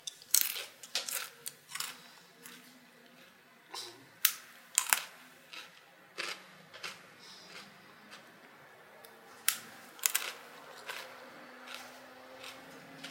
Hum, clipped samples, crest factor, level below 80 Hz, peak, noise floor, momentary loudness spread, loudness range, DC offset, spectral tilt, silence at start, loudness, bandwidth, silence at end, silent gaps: none; under 0.1%; 40 dB; under -90 dBFS; -2 dBFS; -60 dBFS; 24 LU; 11 LU; under 0.1%; 1.5 dB/octave; 0 s; -35 LUFS; 17 kHz; 0 s; none